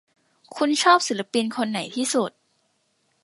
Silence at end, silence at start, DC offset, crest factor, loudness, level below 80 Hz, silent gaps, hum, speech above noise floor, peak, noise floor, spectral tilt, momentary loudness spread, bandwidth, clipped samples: 0.95 s; 0.5 s; under 0.1%; 20 dB; -22 LUFS; -80 dBFS; none; none; 47 dB; -4 dBFS; -69 dBFS; -2.5 dB/octave; 9 LU; 11.5 kHz; under 0.1%